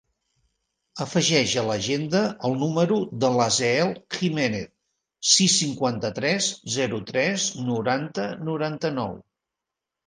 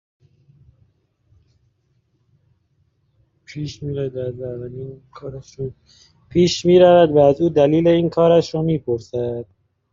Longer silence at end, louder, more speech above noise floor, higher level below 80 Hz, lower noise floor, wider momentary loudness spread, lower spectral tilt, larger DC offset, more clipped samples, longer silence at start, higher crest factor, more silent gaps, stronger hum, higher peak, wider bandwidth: first, 0.85 s vs 0.5 s; second, -23 LUFS vs -17 LUFS; first, 62 dB vs 48 dB; second, -62 dBFS vs -52 dBFS; first, -86 dBFS vs -65 dBFS; second, 9 LU vs 22 LU; second, -3.5 dB/octave vs -6.5 dB/octave; neither; neither; second, 0.95 s vs 3.5 s; about the same, 20 dB vs 18 dB; neither; neither; second, -6 dBFS vs -2 dBFS; first, 10.5 kHz vs 7.6 kHz